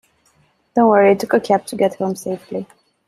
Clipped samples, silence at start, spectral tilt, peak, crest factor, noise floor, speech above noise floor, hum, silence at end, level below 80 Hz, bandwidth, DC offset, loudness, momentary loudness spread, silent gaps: under 0.1%; 0.75 s; -6 dB/octave; -2 dBFS; 16 dB; -59 dBFS; 43 dB; none; 0.45 s; -62 dBFS; 14.5 kHz; under 0.1%; -17 LUFS; 14 LU; none